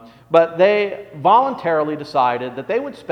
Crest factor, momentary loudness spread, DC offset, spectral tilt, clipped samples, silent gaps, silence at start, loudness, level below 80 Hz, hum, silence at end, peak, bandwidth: 18 dB; 9 LU; under 0.1%; -6.5 dB/octave; under 0.1%; none; 0.05 s; -18 LUFS; -64 dBFS; none; 0 s; 0 dBFS; 9.6 kHz